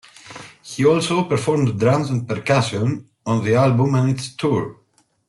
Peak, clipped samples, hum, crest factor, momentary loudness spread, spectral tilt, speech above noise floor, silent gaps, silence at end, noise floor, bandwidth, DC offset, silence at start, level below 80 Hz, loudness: -4 dBFS; under 0.1%; none; 16 dB; 17 LU; -6.5 dB/octave; 22 dB; none; 0.55 s; -40 dBFS; 12 kHz; under 0.1%; 0.25 s; -56 dBFS; -19 LUFS